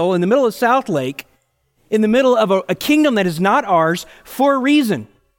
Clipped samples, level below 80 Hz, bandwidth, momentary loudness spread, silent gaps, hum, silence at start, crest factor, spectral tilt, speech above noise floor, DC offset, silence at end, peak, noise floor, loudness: under 0.1%; -56 dBFS; 17 kHz; 9 LU; none; none; 0 s; 14 dB; -5.5 dB/octave; 47 dB; under 0.1%; 0.35 s; -2 dBFS; -63 dBFS; -16 LUFS